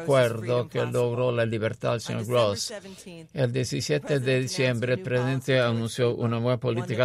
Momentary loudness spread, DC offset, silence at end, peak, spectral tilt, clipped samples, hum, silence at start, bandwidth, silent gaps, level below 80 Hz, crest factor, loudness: 6 LU; under 0.1%; 0 s; -10 dBFS; -5.5 dB/octave; under 0.1%; none; 0 s; 14.5 kHz; none; -60 dBFS; 16 dB; -26 LUFS